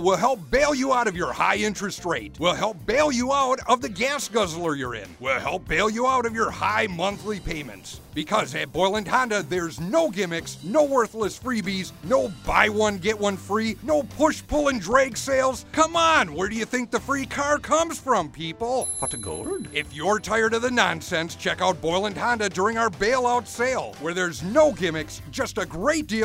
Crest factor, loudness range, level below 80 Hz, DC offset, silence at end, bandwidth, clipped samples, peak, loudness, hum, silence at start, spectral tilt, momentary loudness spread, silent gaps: 22 dB; 3 LU; -46 dBFS; under 0.1%; 0 s; 16 kHz; under 0.1%; -2 dBFS; -24 LUFS; none; 0 s; -3.5 dB/octave; 8 LU; none